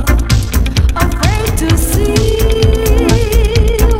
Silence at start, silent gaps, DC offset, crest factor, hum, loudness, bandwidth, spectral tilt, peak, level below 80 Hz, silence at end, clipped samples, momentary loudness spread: 0 s; none; under 0.1%; 10 dB; none; -12 LUFS; 16.5 kHz; -5.5 dB/octave; 0 dBFS; -12 dBFS; 0 s; 0.3%; 2 LU